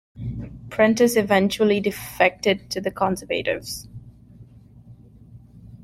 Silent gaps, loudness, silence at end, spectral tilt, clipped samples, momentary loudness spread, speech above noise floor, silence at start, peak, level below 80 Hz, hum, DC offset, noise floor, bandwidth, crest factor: none; -21 LUFS; 0.1 s; -4.5 dB/octave; under 0.1%; 16 LU; 26 dB; 0.15 s; -2 dBFS; -50 dBFS; none; under 0.1%; -47 dBFS; 16.5 kHz; 20 dB